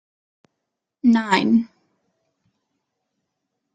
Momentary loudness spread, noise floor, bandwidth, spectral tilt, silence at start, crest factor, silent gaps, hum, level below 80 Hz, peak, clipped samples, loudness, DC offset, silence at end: 6 LU; -81 dBFS; 9 kHz; -5.5 dB/octave; 1.05 s; 22 dB; none; none; -68 dBFS; -2 dBFS; under 0.1%; -19 LUFS; under 0.1%; 2.1 s